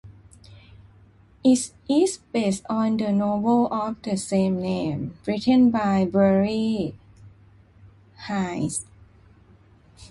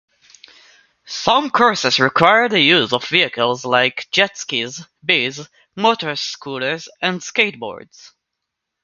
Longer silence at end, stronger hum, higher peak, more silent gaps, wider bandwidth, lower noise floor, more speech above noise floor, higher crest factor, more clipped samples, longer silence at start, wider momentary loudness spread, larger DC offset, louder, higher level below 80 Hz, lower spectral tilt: second, 0.05 s vs 1.05 s; neither; second, -6 dBFS vs 0 dBFS; neither; first, 11.5 kHz vs 9 kHz; second, -54 dBFS vs -79 dBFS; second, 32 dB vs 61 dB; about the same, 18 dB vs 18 dB; neither; second, 0.05 s vs 1.05 s; second, 9 LU vs 14 LU; neither; second, -23 LUFS vs -16 LUFS; first, -54 dBFS vs -62 dBFS; first, -6 dB/octave vs -3 dB/octave